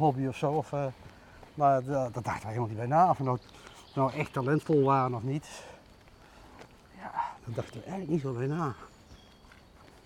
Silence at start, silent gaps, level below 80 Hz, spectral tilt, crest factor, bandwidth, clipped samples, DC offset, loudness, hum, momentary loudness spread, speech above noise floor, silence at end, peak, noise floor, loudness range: 0 s; none; -62 dBFS; -7.5 dB/octave; 18 dB; 13 kHz; under 0.1%; under 0.1%; -30 LUFS; none; 21 LU; 26 dB; 0.9 s; -12 dBFS; -56 dBFS; 8 LU